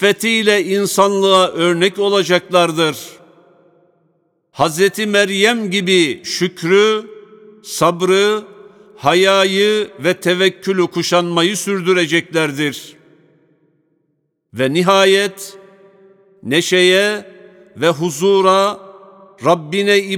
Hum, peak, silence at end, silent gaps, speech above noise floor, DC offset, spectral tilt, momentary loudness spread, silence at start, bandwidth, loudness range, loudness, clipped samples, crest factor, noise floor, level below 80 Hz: none; 0 dBFS; 0 s; none; 53 dB; under 0.1%; -4 dB/octave; 9 LU; 0 s; 17.5 kHz; 4 LU; -14 LUFS; under 0.1%; 16 dB; -67 dBFS; -64 dBFS